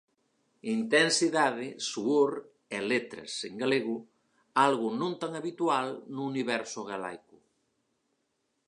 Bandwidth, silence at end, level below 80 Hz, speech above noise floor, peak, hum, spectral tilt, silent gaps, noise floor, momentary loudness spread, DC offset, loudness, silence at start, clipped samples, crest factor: 11 kHz; 1.5 s; -82 dBFS; 49 dB; -10 dBFS; none; -3.5 dB/octave; none; -78 dBFS; 13 LU; under 0.1%; -30 LUFS; 0.65 s; under 0.1%; 22 dB